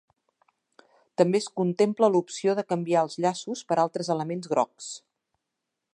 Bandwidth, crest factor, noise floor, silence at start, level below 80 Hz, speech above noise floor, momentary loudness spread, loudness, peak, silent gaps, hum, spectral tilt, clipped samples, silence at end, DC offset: 11 kHz; 22 dB; -84 dBFS; 1.2 s; -80 dBFS; 59 dB; 11 LU; -26 LUFS; -6 dBFS; none; none; -5.5 dB/octave; under 0.1%; 0.95 s; under 0.1%